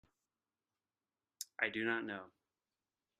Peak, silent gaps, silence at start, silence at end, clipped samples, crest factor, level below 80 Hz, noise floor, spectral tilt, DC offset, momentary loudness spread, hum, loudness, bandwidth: -18 dBFS; none; 1.4 s; 0.95 s; under 0.1%; 26 dB; -88 dBFS; under -90 dBFS; -3 dB/octave; under 0.1%; 13 LU; none; -40 LUFS; 10.5 kHz